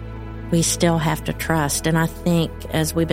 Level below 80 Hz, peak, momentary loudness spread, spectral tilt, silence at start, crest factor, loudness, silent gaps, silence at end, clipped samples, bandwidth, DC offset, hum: -36 dBFS; -2 dBFS; 6 LU; -4.5 dB/octave; 0 s; 18 dB; -20 LUFS; none; 0 s; under 0.1%; 16.5 kHz; under 0.1%; none